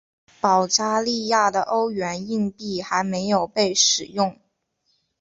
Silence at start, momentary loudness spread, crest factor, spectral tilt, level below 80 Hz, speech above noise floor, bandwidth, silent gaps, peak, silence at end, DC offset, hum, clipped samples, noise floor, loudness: 0.45 s; 8 LU; 20 dB; -2.5 dB/octave; -62 dBFS; 49 dB; 8.2 kHz; none; -4 dBFS; 0.9 s; under 0.1%; none; under 0.1%; -71 dBFS; -21 LUFS